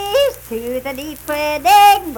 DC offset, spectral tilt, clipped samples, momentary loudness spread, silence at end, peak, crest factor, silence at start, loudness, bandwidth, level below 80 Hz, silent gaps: under 0.1%; -2 dB/octave; under 0.1%; 17 LU; 0 s; -2 dBFS; 14 dB; 0 s; -14 LUFS; 19 kHz; -44 dBFS; none